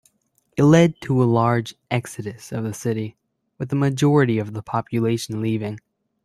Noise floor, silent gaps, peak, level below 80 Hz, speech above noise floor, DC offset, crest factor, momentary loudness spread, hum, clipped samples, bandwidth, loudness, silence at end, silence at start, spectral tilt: -67 dBFS; none; -2 dBFS; -58 dBFS; 47 dB; under 0.1%; 18 dB; 16 LU; none; under 0.1%; 13.5 kHz; -21 LUFS; 0.45 s; 0.55 s; -7 dB/octave